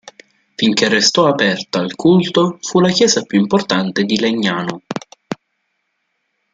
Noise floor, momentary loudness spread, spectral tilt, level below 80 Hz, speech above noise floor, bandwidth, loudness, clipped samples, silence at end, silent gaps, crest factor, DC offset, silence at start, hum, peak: -70 dBFS; 16 LU; -4 dB/octave; -58 dBFS; 55 dB; 9.4 kHz; -14 LUFS; under 0.1%; 1.2 s; none; 16 dB; under 0.1%; 0.6 s; none; 0 dBFS